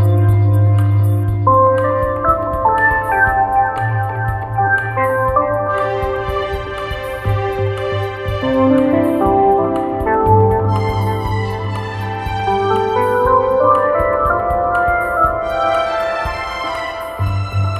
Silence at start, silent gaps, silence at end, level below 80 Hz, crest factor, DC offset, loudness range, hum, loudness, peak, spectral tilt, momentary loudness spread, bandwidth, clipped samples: 0 s; none; 0 s; -32 dBFS; 14 dB; under 0.1%; 4 LU; none; -16 LUFS; 0 dBFS; -8 dB/octave; 9 LU; 14 kHz; under 0.1%